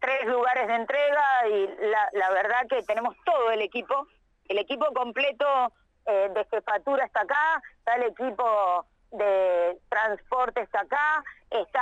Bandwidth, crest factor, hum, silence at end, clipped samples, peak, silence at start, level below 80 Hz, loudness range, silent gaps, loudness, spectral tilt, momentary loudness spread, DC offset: 9 kHz; 12 dB; none; 0 s; under 0.1%; -14 dBFS; 0 s; -66 dBFS; 2 LU; none; -26 LUFS; -3.5 dB/octave; 6 LU; under 0.1%